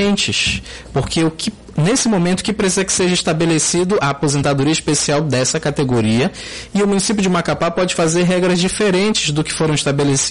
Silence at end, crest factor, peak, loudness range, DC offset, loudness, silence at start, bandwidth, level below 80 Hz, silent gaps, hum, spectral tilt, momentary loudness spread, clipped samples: 0 s; 10 dB; -6 dBFS; 1 LU; under 0.1%; -16 LUFS; 0 s; 11.5 kHz; -40 dBFS; none; none; -4 dB/octave; 5 LU; under 0.1%